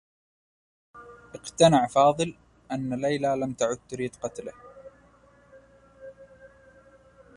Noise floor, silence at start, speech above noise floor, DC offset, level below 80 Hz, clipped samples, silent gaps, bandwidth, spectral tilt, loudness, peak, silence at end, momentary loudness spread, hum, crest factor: -58 dBFS; 0.95 s; 33 dB; under 0.1%; -62 dBFS; under 0.1%; none; 11.5 kHz; -5 dB/octave; -25 LUFS; -6 dBFS; 0.9 s; 28 LU; none; 22 dB